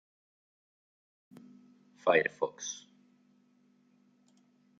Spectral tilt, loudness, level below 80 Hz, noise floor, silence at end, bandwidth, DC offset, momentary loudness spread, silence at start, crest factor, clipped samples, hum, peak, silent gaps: -2.5 dB/octave; -32 LUFS; -86 dBFS; -68 dBFS; 2 s; 7.8 kHz; under 0.1%; 26 LU; 2.05 s; 28 dB; under 0.1%; none; -10 dBFS; none